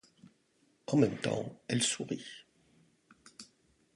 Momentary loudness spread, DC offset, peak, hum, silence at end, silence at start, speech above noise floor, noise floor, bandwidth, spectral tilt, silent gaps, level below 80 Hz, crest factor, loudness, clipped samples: 23 LU; under 0.1%; -12 dBFS; none; 0.5 s; 0.9 s; 39 dB; -72 dBFS; 11.5 kHz; -4.5 dB/octave; none; -72 dBFS; 24 dB; -33 LUFS; under 0.1%